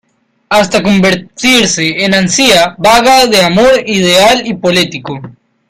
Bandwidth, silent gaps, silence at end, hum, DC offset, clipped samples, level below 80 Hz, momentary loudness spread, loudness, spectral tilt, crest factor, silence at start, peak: 16.5 kHz; none; 0.4 s; none; under 0.1%; 0.3%; -40 dBFS; 6 LU; -8 LUFS; -3.5 dB/octave; 10 dB; 0.5 s; 0 dBFS